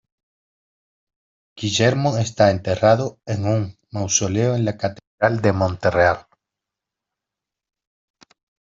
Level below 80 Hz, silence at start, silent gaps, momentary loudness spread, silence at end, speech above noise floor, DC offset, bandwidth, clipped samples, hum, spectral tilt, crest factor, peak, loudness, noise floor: -54 dBFS; 1.55 s; 5.07-5.18 s; 10 LU; 2.55 s; 67 dB; under 0.1%; 7.8 kHz; under 0.1%; none; -4.5 dB/octave; 20 dB; -2 dBFS; -20 LUFS; -86 dBFS